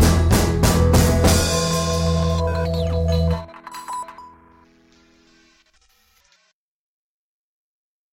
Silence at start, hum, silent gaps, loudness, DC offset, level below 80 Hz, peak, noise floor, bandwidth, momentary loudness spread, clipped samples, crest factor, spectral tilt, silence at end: 0 s; none; none; -19 LUFS; under 0.1%; -28 dBFS; -4 dBFS; -65 dBFS; 16.5 kHz; 15 LU; under 0.1%; 16 dB; -5 dB/octave; 3.85 s